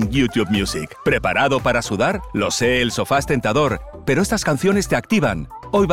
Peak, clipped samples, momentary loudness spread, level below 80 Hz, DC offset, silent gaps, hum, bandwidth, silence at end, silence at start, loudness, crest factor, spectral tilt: -6 dBFS; under 0.1%; 5 LU; -38 dBFS; 0.4%; none; none; 16.5 kHz; 0 s; 0 s; -19 LUFS; 14 dB; -5 dB/octave